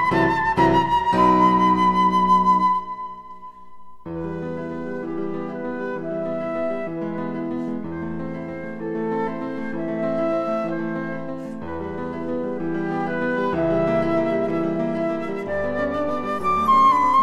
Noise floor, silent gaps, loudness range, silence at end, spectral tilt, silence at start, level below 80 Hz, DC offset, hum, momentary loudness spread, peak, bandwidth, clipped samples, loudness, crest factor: -44 dBFS; none; 9 LU; 0 s; -7 dB/octave; 0 s; -48 dBFS; under 0.1%; none; 14 LU; -4 dBFS; 12 kHz; under 0.1%; -22 LUFS; 18 dB